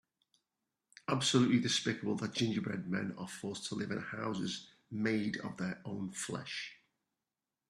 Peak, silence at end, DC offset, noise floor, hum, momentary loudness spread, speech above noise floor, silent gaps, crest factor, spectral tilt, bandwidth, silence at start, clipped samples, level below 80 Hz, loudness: -16 dBFS; 0.95 s; under 0.1%; under -90 dBFS; none; 12 LU; over 54 dB; none; 22 dB; -4.5 dB/octave; 13 kHz; 1.1 s; under 0.1%; -74 dBFS; -36 LUFS